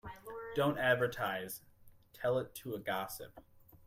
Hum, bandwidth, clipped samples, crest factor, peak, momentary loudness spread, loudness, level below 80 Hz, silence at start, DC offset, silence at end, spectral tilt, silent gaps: none; 16 kHz; under 0.1%; 20 dB; -18 dBFS; 16 LU; -36 LUFS; -66 dBFS; 0.05 s; under 0.1%; 0.1 s; -5 dB/octave; none